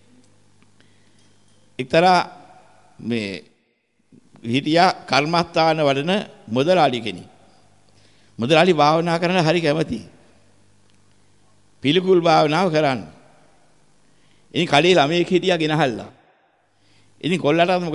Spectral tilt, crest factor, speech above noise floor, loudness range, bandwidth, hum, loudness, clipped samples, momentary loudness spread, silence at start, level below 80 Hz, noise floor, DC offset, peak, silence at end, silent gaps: -5.5 dB/octave; 18 dB; 48 dB; 4 LU; 11.5 kHz; none; -18 LUFS; under 0.1%; 14 LU; 1.8 s; -60 dBFS; -66 dBFS; 0.2%; -2 dBFS; 0 s; none